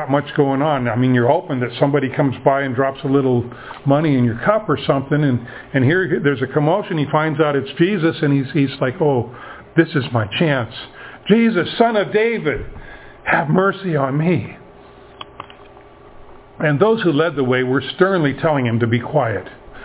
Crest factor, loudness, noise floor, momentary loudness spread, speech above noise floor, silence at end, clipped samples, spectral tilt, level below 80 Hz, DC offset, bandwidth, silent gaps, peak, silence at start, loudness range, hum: 18 dB; -17 LUFS; -42 dBFS; 12 LU; 25 dB; 0 s; under 0.1%; -11 dB/octave; -48 dBFS; under 0.1%; 4 kHz; none; 0 dBFS; 0 s; 4 LU; none